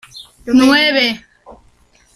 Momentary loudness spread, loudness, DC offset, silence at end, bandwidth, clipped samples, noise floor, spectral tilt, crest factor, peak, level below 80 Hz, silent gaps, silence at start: 19 LU; -12 LUFS; under 0.1%; 0.6 s; 14 kHz; under 0.1%; -51 dBFS; -3 dB/octave; 16 dB; 0 dBFS; -48 dBFS; none; 0.15 s